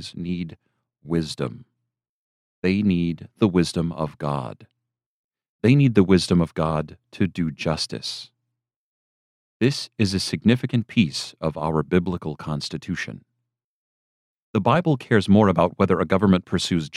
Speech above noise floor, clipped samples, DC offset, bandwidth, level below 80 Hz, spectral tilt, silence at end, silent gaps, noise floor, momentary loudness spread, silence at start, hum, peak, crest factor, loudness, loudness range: 60 dB; under 0.1%; under 0.1%; 12.5 kHz; -50 dBFS; -6.5 dB/octave; 0 s; 2.09-2.62 s, 5.06-5.31 s, 5.49-5.59 s, 8.76-9.60 s, 13.64-14.53 s; -82 dBFS; 12 LU; 0 s; none; -4 dBFS; 20 dB; -22 LUFS; 6 LU